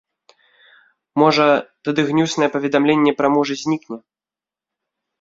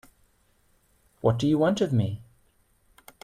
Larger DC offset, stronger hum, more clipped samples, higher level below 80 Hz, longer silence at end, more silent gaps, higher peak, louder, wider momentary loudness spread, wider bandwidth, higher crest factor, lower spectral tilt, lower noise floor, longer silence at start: neither; neither; neither; about the same, -62 dBFS vs -58 dBFS; first, 1.25 s vs 1 s; neither; first, -2 dBFS vs -10 dBFS; first, -17 LUFS vs -25 LUFS; about the same, 10 LU vs 8 LU; second, 7.8 kHz vs 14 kHz; about the same, 18 dB vs 18 dB; second, -5.5 dB/octave vs -7.5 dB/octave; first, under -90 dBFS vs -65 dBFS; about the same, 1.15 s vs 1.25 s